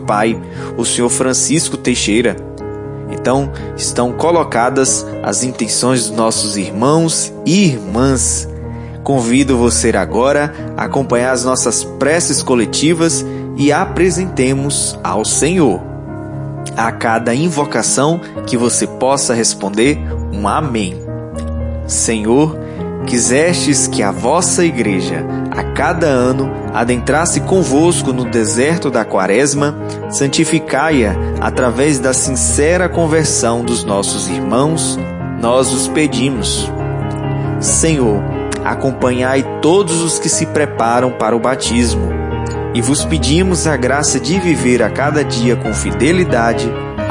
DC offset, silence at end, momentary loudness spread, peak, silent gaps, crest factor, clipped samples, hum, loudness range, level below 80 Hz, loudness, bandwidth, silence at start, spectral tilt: under 0.1%; 0 s; 8 LU; 0 dBFS; none; 14 dB; under 0.1%; none; 2 LU; -32 dBFS; -14 LUFS; 11.5 kHz; 0 s; -4 dB/octave